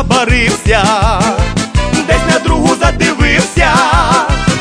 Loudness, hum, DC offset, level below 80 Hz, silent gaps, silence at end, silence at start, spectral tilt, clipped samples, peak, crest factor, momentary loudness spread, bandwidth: -10 LUFS; none; under 0.1%; -18 dBFS; none; 0 s; 0 s; -4.5 dB/octave; under 0.1%; 0 dBFS; 10 dB; 4 LU; 11 kHz